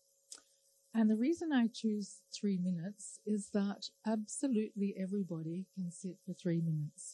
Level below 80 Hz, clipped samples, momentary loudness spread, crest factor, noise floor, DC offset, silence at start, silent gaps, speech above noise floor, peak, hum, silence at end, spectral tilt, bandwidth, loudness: -86 dBFS; under 0.1%; 13 LU; 14 dB; -72 dBFS; under 0.1%; 0.3 s; none; 35 dB; -22 dBFS; none; 0 s; -6 dB/octave; 11.5 kHz; -37 LUFS